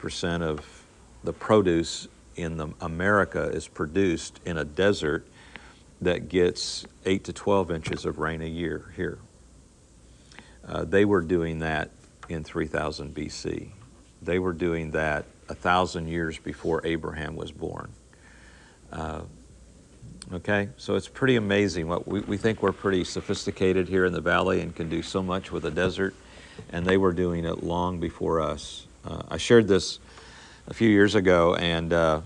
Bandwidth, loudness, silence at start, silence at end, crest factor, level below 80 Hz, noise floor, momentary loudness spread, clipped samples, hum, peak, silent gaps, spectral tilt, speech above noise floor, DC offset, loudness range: 11 kHz; -26 LUFS; 0 s; 0 s; 22 dB; -50 dBFS; -54 dBFS; 16 LU; under 0.1%; none; -6 dBFS; none; -5.5 dB/octave; 28 dB; under 0.1%; 6 LU